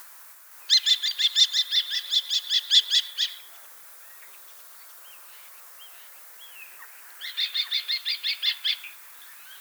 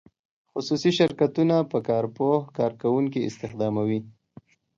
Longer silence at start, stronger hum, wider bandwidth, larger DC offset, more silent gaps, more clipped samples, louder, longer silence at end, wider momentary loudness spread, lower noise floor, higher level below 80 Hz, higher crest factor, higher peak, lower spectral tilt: second, 0 s vs 0.55 s; neither; first, over 20 kHz vs 7.6 kHz; neither; neither; neither; first, -22 LUFS vs -25 LUFS; second, 0 s vs 0.65 s; first, 25 LU vs 9 LU; second, -48 dBFS vs -52 dBFS; second, under -90 dBFS vs -64 dBFS; about the same, 22 dB vs 18 dB; about the same, -6 dBFS vs -8 dBFS; second, 7.5 dB/octave vs -6.5 dB/octave